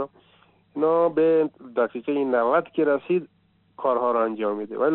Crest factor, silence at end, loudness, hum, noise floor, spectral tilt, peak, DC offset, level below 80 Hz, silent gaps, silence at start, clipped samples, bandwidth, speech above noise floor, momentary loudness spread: 14 dB; 0 s; -23 LUFS; none; -59 dBFS; -5.5 dB/octave; -10 dBFS; under 0.1%; -76 dBFS; none; 0 s; under 0.1%; 4.1 kHz; 37 dB; 7 LU